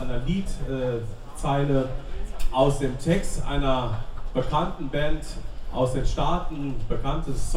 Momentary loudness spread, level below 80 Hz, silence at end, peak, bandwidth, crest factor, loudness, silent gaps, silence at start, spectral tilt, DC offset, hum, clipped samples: 11 LU; -30 dBFS; 0 s; -8 dBFS; 12 kHz; 16 dB; -27 LUFS; none; 0 s; -6 dB/octave; under 0.1%; none; under 0.1%